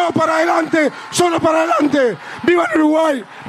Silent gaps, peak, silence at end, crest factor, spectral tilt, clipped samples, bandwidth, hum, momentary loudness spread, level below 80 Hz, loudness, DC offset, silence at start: none; -4 dBFS; 0 s; 12 dB; -4.5 dB/octave; under 0.1%; 14.5 kHz; none; 4 LU; -58 dBFS; -15 LUFS; under 0.1%; 0 s